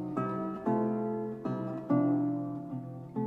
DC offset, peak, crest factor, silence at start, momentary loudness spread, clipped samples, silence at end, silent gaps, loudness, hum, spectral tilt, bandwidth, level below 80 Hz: under 0.1%; -16 dBFS; 16 dB; 0 s; 11 LU; under 0.1%; 0 s; none; -33 LUFS; none; -10.5 dB/octave; 4.4 kHz; -70 dBFS